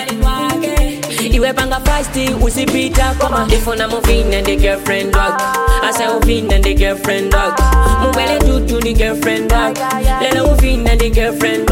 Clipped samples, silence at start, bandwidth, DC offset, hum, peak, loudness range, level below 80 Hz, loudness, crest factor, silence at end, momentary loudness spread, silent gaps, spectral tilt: under 0.1%; 0 s; 17 kHz; under 0.1%; none; -2 dBFS; 1 LU; -16 dBFS; -14 LUFS; 12 dB; 0 s; 3 LU; none; -4.5 dB/octave